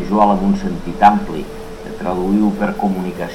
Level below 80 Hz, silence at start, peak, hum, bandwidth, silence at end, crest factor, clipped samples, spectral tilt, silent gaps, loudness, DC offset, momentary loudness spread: -34 dBFS; 0 s; 0 dBFS; none; 13.5 kHz; 0 s; 16 dB; under 0.1%; -7.5 dB/octave; none; -17 LUFS; 0.4%; 15 LU